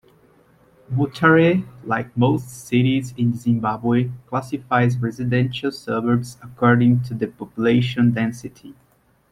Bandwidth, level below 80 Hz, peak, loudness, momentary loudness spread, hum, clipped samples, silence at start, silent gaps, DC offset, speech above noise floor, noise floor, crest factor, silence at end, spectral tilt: 12.5 kHz; -54 dBFS; -2 dBFS; -20 LUFS; 11 LU; none; under 0.1%; 0.9 s; none; under 0.1%; 35 dB; -55 dBFS; 18 dB; 0.6 s; -7.5 dB/octave